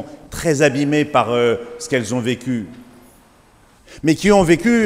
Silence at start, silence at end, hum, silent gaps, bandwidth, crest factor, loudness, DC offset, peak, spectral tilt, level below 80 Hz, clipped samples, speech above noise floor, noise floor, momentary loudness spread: 0 s; 0 s; none; none; 16 kHz; 16 dB; -17 LUFS; under 0.1%; -2 dBFS; -5.5 dB/octave; -44 dBFS; under 0.1%; 34 dB; -50 dBFS; 11 LU